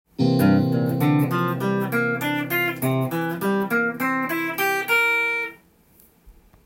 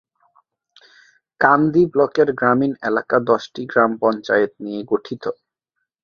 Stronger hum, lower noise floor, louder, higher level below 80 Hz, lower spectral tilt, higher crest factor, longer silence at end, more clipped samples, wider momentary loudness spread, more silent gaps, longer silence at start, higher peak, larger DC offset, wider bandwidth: neither; second, -55 dBFS vs -78 dBFS; second, -21 LUFS vs -18 LUFS; about the same, -60 dBFS vs -60 dBFS; about the same, -6 dB/octave vs -7 dB/octave; about the same, 16 dB vs 18 dB; second, 0.35 s vs 0.7 s; neither; second, 6 LU vs 9 LU; neither; second, 0.2 s vs 1.4 s; second, -6 dBFS vs -2 dBFS; neither; first, 17 kHz vs 7 kHz